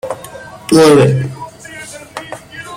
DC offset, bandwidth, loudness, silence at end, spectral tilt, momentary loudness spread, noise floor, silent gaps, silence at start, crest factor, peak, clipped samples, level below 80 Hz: under 0.1%; 16 kHz; -10 LUFS; 0 s; -6 dB/octave; 22 LU; -32 dBFS; none; 0.05 s; 14 dB; 0 dBFS; under 0.1%; -48 dBFS